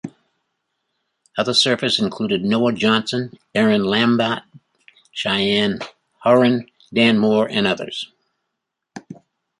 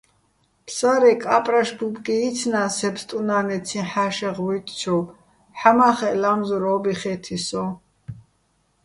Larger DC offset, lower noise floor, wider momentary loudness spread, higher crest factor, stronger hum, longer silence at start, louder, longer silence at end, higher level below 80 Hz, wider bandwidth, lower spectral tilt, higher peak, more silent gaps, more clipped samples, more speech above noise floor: neither; first, -79 dBFS vs -66 dBFS; about the same, 15 LU vs 13 LU; about the same, 18 dB vs 22 dB; neither; second, 0.05 s vs 0.65 s; first, -18 LUFS vs -21 LUFS; second, 0.45 s vs 0.65 s; about the same, -60 dBFS vs -60 dBFS; about the same, 11.5 kHz vs 11.5 kHz; about the same, -5 dB/octave vs -4.5 dB/octave; about the same, -2 dBFS vs 0 dBFS; neither; neither; first, 61 dB vs 45 dB